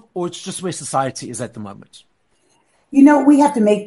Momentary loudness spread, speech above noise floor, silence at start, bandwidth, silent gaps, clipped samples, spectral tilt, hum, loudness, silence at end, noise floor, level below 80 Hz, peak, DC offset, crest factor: 18 LU; 46 dB; 0.15 s; 11.5 kHz; none; under 0.1%; -5.5 dB/octave; none; -16 LUFS; 0 s; -62 dBFS; -62 dBFS; -2 dBFS; under 0.1%; 16 dB